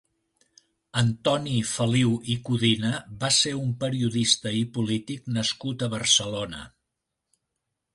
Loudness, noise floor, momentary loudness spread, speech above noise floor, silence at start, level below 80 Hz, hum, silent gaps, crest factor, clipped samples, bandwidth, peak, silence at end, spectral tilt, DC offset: -25 LUFS; -82 dBFS; 9 LU; 57 dB; 0.95 s; -58 dBFS; none; none; 20 dB; under 0.1%; 11.5 kHz; -6 dBFS; 1.25 s; -4 dB/octave; under 0.1%